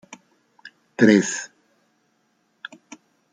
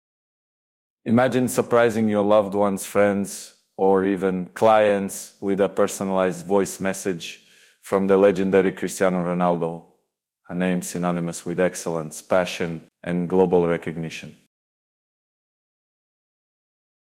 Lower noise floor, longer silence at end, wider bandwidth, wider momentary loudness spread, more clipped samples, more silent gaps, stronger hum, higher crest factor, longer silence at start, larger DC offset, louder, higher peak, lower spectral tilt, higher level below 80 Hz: second, -67 dBFS vs -74 dBFS; second, 1.85 s vs 2.85 s; second, 9.4 kHz vs 16.5 kHz; first, 25 LU vs 12 LU; neither; neither; neither; about the same, 22 dB vs 18 dB; second, 0.65 s vs 1.05 s; neither; first, -19 LUFS vs -22 LUFS; about the same, -2 dBFS vs -4 dBFS; about the same, -5 dB/octave vs -5.5 dB/octave; about the same, -66 dBFS vs -64 dBFS